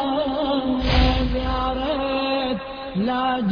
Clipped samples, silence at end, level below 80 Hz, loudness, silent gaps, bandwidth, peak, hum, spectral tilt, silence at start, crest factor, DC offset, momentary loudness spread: under 0.1%; 0 s; -28 dBFS; -22 LUFS; none; 5.4 kHz; -4 dBFS; none; -7.5 dB/octave; 0 s; 18 dB; under 0.1%; 6 LU